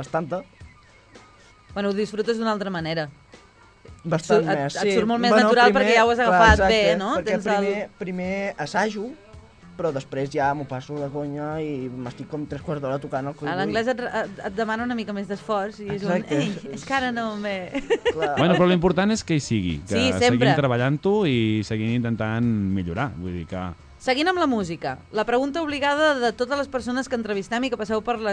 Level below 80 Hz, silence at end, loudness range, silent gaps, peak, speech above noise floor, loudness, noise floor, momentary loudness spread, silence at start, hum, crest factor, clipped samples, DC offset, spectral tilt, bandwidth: -42 dBFS; 0 s; 10 LU; none; 0 dBFS; 29 dB; -23 LUFS; -52 dBFS; 13 LU; 0 s; none; 22 dB; under 0.1%; under 0.1%; -5.5 dB/octave; 10.5 kHz